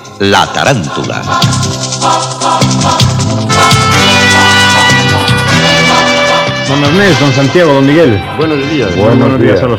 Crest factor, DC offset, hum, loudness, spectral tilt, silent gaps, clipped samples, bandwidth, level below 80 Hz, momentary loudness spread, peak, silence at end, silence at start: 8 dB; under 0.1%; none; -7 LUFS; -4 dB/octave; none; 2%; 17.5 kHz; -34 dBFS; 7 LU; 0 dBFS; 0 s; 0 s